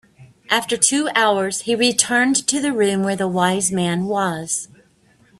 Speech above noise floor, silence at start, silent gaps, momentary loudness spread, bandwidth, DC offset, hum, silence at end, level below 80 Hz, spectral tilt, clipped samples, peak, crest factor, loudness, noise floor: 37 dB; 0.2 s; none; 6 LU; 14.5 kHz; under 0.1%; none; 0.75 s; -60 dBFS; -3 dB/octave; under 0.1%; 0 dBFS; 20 dB; -18 LUFS; -55 dBFS